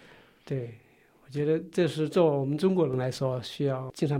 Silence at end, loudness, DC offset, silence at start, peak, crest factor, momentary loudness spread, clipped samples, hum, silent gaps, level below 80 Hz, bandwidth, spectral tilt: 0 s; -28 LUFS; under 0.1%; 0.45 s; -12 dBFS; 18 dB; 11 LU; under 0.1%; none; none; -66 dBFS; 15.5 kHz; -7.5 dB/octave